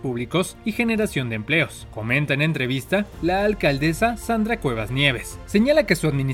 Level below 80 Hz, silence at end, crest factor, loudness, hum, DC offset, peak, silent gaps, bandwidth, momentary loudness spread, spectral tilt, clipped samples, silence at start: -40 dBFS; 0 s; 18 dB; -22 LUFS; none; under 0.1%; -4 dBFS; none; 16.5 kHz; 6 LU; -5.5 dB/octave; under 0.1%; 0 s